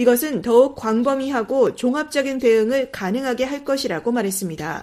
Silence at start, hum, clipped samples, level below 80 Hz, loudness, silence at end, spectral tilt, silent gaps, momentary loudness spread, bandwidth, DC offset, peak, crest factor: 0 s; none; under 0.1%; -56 dBFS; -20 LUFS; 0 s; -4.5 dB/octave; none; 7 LU; 15.5 kHz; under 0.1%; -2 dBFS; 16 dB